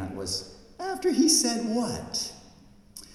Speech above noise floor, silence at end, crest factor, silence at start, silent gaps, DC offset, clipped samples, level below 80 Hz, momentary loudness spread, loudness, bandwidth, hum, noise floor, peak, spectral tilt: 27 dB; 0 s; 20 dB; 0 s; none; under 0.1%; under 0.1%; -58 dBFS; 22 LU; -26 LUFS; 16 kHz; none; -53 dBFS; -8 dBFS; -2.5 dB/octave